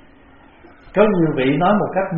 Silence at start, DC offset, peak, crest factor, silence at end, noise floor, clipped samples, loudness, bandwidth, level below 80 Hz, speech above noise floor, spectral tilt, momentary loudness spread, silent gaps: 0.85 s; under 0.1%; -2 dBFS; 16 dB; 0 s; -47 dBFS; under 0.1%; -17 LUFS; 4.1 kHz; -44 dBFS; 31 dB; -6 dB/octave; 3 LU; none